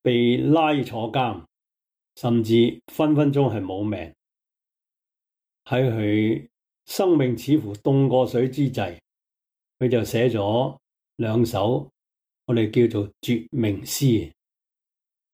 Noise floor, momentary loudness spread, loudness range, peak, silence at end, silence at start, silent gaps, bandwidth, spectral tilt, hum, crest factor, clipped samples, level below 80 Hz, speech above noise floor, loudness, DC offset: -87 dBFS; 10 LU; 3 LU; -6 dBFS; 1.05 s; 0.05 s; none; 16.5 kHz; -6.5 dB/octave; none; 16 dB; under 0.1%; -58 dBFS; 66 dB; -22 LUFS; under 0.1%